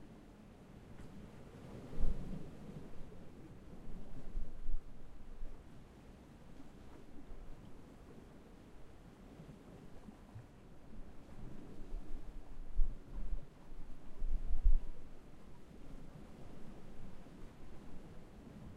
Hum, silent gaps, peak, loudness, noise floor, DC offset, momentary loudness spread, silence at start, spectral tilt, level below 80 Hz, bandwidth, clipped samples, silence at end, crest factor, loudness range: none; none; -16 dBFS; -52 LUFS; -57 dBFS; under 0.1%; 14 LU; 0 s; -7.5 dB/octave; -42 dBFS; 3.5 kHz; under 0.1%; 0 s; 22 dB; 12 LU